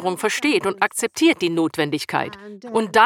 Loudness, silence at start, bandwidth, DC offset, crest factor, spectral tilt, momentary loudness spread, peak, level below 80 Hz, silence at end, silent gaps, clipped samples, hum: -21 LUFS; 0 s; 17 kHz; under 0.1%; 18 dB; -3.5 dB/octave; 7 LU; -2 dBFS; -66 dBFS; 0 s; none; under 0.1%; none